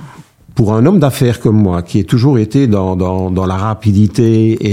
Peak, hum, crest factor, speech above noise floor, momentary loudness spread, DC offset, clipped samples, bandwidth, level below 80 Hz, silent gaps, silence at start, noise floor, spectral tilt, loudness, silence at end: 0 dBFS; none; 12 dB; 27 dB; 5 LU; under 0.1%; under 0.1%; 15.5 kHz; -38 dBFS; none; 0 s; -37 dBFS; -8 dB/octave; -12 LUFS; 0 s